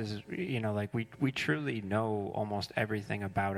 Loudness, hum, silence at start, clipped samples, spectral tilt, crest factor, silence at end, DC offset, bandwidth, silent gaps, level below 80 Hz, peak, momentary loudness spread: -34 LUFS; none; 0 s; under 0.1%; -6.5 dB/octave; 18 dB; 0 s; under 0.1%; 15.5 kHz; none; -64 dBFS; -16 dBFS; 4 LU